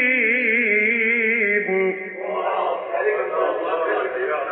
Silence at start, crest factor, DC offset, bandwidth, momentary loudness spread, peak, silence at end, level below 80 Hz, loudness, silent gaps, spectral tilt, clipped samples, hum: 0 s; 14 dB; under 0.1%; 4.2 kHz; 7 LU; -8 dBFS; 0 s; -72 dBFS; -20 LUFS; none; -2.5 dB/octave; under 0.1%; none